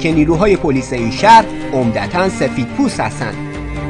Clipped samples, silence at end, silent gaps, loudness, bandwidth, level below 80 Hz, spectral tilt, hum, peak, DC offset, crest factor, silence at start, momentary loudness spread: 0.6%; 0 s; none; -14 LUFS; 12 kHz; -32 dBFS; -6 dB/octave; none; 0 dBFS; under 0.1%; 14 dB; 0 s; 13 LU